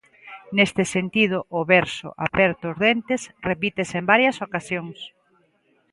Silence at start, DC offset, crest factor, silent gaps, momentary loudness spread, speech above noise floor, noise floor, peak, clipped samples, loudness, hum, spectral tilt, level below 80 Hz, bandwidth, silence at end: 0.25 s; under 0.1%; 22 dB; none; 12 LU; 42 dB; -64 dBFS; -2 dBFS; under 0.1%; -21 LUFS; none; -5 dB/octave; -56 dBFS; 11.5 kHz; 0.85 s